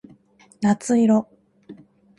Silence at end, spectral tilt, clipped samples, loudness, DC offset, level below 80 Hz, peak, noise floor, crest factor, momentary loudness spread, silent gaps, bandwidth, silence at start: 0.45 s; -6.5 dB/octave; under 0.1%; -20 LUFS; under 0.1%; -66 dBFS; -6 dBFS; -54 dBFS; 16 dB; 9 LU; none; 11.5 kHz; 0.6 s